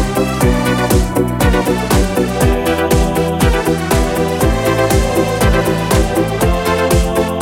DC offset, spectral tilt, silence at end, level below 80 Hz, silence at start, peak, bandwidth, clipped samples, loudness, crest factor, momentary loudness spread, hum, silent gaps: under 0.1%; -5.5 dB/octave; 0 s; -20 dBFS; 0 s; 0 dBFS; 19 kHz; under 0.1%; -14 LUFS; 12 dB; 2 LU; none; none